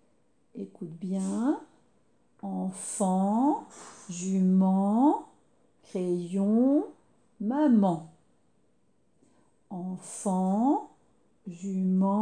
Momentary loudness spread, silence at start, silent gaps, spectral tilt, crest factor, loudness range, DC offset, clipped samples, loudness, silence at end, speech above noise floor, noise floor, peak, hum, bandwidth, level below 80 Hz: 18 LU; 0.55 s; none; -7.5 dB/octave; 16 dB; 6 LU; under 0.1%; under 0.1%; -28 LUFS; 0 s; 44 dB; -71 dBFS; -14 dBFS; none; 10.5 kHz; -78 dBFS